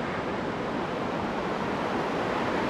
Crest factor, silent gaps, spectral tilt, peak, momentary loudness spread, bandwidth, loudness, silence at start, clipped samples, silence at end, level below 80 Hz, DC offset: 12 dB; none; -6 dB/octave; -16 dBFS; 2 LU; 14 kHz; -30 LUFS; 0 s; under 0.1%; 0 s; -52 dBFS; under 0.1%